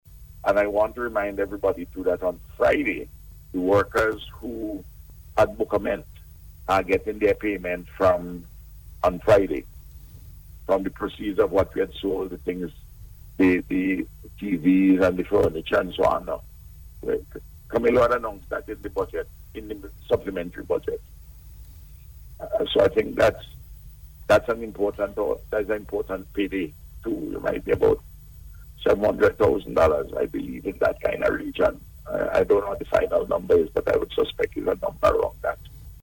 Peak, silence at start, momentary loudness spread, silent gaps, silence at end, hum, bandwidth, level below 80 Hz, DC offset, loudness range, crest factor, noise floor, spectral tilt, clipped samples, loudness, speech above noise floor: -4 dBFS; 0.1 s; 14 LU; none; 0.05 s; none; 17.5 kHz; -44 dBFS; under 0.1%; 4 LU; 20 dB; -45 dBFS; -6.5 dB/octave; under 0.1%; -24 LUFS; 21 dB